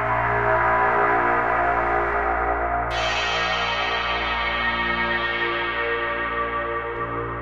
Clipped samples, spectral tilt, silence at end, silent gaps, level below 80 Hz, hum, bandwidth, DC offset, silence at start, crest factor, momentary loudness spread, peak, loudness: under 0.1%; -4.5 dB/octave; 0 s; none; -38 dBFS; none; 8.6 kHz; 0.3%; 0 s; 14 dB; 6 LU; -8 dBFS; -22 LUFS